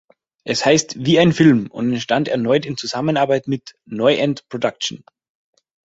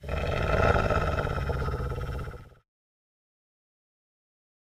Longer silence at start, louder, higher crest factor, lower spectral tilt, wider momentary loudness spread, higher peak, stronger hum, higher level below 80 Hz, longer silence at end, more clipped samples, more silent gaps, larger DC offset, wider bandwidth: first, 0.45 s vs 0 s; first, -18 LUFS vs -28 LUFS; about the same, 18 dB vs 20 dB; second, -5 dB/octave vs -7 dB/octave; second, 11 LU vs 14 LU; first, 0 dBFS vs -10 dBFS; neither; second, -56 dBFS vs -36 dBFS; second, 0.9 s vs 2.3 s; neither; neither; neither; second, 8 kHz vs 15.5 kHz